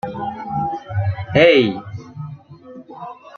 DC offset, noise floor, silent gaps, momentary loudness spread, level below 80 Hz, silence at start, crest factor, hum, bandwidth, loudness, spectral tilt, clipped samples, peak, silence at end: under 0.1%; -40 dBFS; none; 23 LU; -52 dBFS; 0.05 s; 18 dB; none; 6.6 kHz; -17 LUFS; -7 dB/octave; under 0.1%; -2 dBFS; 0.1 s